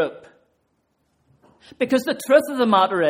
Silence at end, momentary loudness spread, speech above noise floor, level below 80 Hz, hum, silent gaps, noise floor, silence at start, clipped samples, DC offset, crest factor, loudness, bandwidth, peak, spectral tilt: 0 s; 9 LU; 50 dB; -68 dBFS; none; none; -69 dBFS; 0 s; under 0.1%; under 0.1%; 18 dB; -19 LUFS; 16.5 kHz; -2 dBFS; -4.5 dB/octave